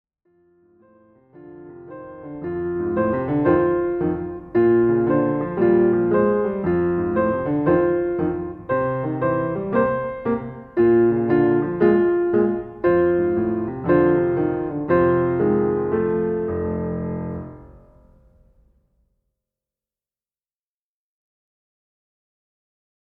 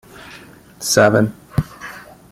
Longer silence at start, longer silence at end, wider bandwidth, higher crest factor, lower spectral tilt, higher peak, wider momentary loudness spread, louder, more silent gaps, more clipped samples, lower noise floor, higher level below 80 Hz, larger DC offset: first, 1.35 s vs 0.2 s; first, 5.35 s vs 0.3 s; second, 4 kHz vs 16 kHz; about the same, 16 dB vs 18 dB; first, -12 dB/octave vs -4.5 dB/octave; about the same, -4 dBFS vs -2 dBFS; second, 11 LU vs 25 LU; second, -20 LUFS vs -17 LUFS; neither; neither; first, under -90 dBFS vs -41 dBFS; about the same, -48 dBFS vs -44 dBFS; neither